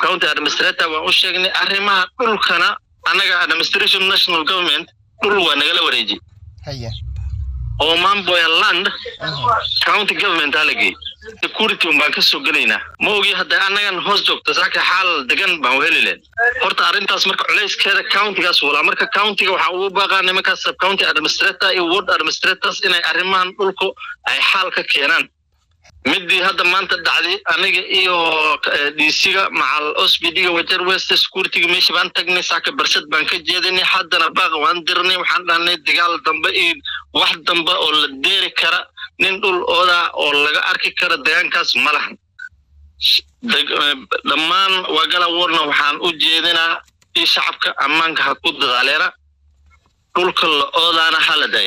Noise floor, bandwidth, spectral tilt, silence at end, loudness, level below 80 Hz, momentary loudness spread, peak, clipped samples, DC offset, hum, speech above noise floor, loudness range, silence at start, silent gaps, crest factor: -60 dBFS; over 20 kHz; -2 dB/octave; 0 s; -14 LUFS; -44 dBFS; 5 LU; -6 dBFS; under 0.1%; under 0.1%; none; 44 dB; 2 LU; 0 s; none; 10 dB